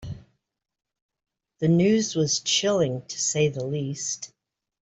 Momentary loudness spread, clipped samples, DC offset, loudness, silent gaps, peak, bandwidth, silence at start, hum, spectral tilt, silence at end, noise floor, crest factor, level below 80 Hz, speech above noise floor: 13 LU; under 0.1%; under 0.1%; -24 LUFS; 1.02-1.09 s; -10 dBFS; 8.4 kHz; 0 s; none; -4 dB/octave; 0.55 s; -79 dBFS; 16 dB; -58 dBFS; 56 dB